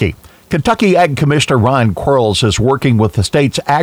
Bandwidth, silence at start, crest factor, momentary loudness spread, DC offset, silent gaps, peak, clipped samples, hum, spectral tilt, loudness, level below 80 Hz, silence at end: 16 kHz; 0 s; 12 dB; 3 LU; under 0.1%; none; 0 dBFS; under 0.1%; none; -5.5 dB/octave; -12 LUFS; -34 dBFS; 0 s